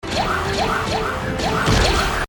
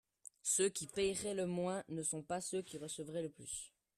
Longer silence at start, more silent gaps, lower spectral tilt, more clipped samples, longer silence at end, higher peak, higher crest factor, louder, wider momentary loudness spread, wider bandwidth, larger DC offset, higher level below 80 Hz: second, 0.05 s vs 0.45 s; neither; about the same, -4 dB/octave vs -3.5 dB/octave; neither; second, 0 s vs 0.3 s; first, -4 dBFS vs -22 dBFS; about the same, 16 dB vs 18 dB; first, -19 LUFS vs -40 LUFS; second, 6 LU vs 11 LU; first, 18 kHz vs 14 kHz; neither; first, -28 dBFS vs -72 dBFS